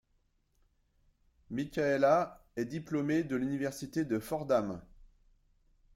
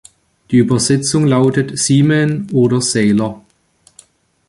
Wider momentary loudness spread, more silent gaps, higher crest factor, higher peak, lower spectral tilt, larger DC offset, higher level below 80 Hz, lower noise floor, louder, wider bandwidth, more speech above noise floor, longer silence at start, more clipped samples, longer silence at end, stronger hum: first, 12 LU vs 4 LU; neither; first, 20 dB vs 14 dB; second, -16 dBFS vs -2 dBFS; about the same, -6.5 dB/octave vs -5.5 dB/octave; neither; second, -64 dBFS vs -50 dBFS; first, -74 dBFS vs -54 dBFS; second, -33 LUFS vs -14 LUFS; first, 16.5 kHz vs 11.5 kHz; about the same, 42 dB vs 41 dB; first, 1.5 s vs 0.5 s; neither; second, 0.9 s vs 1.1 s; neither